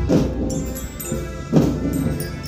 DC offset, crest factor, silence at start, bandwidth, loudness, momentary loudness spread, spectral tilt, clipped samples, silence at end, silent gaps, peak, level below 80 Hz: under 0.1%; 20 dB; 0 s; 16 kHz; -22 LUFS; 9 LU; -6.5 dB/octave; under 0.1%; 0 s; none; -2 dBFS; -32 dBFS